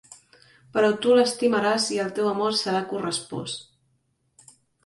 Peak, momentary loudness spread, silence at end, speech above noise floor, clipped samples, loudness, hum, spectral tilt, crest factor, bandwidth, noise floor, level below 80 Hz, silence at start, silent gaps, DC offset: -8 dBFS; 13 LU; 1.25 s; 47 dB; under 0.1%; -23 LUFS; none; -3.5 dB/octave; 18 dB; 11.5 kHz; -70 dBFS; -68 dBFS; 0.1 s; none; under 0.1%